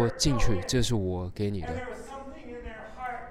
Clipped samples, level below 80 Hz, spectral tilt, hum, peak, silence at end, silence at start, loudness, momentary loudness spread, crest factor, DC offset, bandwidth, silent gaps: under 0.1%; -38 dBFS; -5 dB/octave; none; -12 dBFS; 0 s; 0 s; -30 LUFS; 16 LU; 16 dB; under 0.1%; 14.5 kHz; none